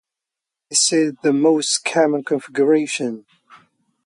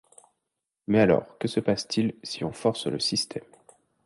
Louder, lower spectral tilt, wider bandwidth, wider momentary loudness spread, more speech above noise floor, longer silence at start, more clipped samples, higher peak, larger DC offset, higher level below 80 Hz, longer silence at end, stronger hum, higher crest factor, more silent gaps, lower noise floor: first, -18 LUFS vs -26 LUFS; second, -3 dB/octave vs -5 dB/octave; about the same, 11.5 kHz vs 11.5 kHz; second, 8 LU vs 12 LU; first, 67 dB vs 58 dB; second, 0.7 s vs 0.9 s; neither; first, -4 dBFS vs -8 dBFS; neither; second, -72 dBFS vs -58 dBFS; first, 0.85 s vs 0.65 s; neither; about the same, 16 dB vs 20 dB; neither; about the same, -85 dBFS vs -84 dBFS